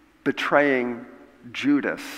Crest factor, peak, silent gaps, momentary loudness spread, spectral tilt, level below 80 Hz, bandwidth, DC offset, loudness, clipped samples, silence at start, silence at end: 22 dB; -4 dBFS; none; 14 LU; -5 dB/octave; -66 dBFS; 15 kHz; under 0.1%; -23 LUFS; under 0.1%; 0.25 s; 0 s